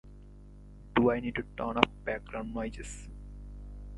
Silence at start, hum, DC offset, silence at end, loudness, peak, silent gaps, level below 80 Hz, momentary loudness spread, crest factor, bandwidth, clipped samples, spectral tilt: 0.05 s; 50 Hz at -45 dBFS; under 0.1%; 0 s; -31 LUFS; 0 dBFS; none; -46 dBFS; 24 LU; 34 dB; 11.5 kHz; under 0.1%; -5.5 dB/octave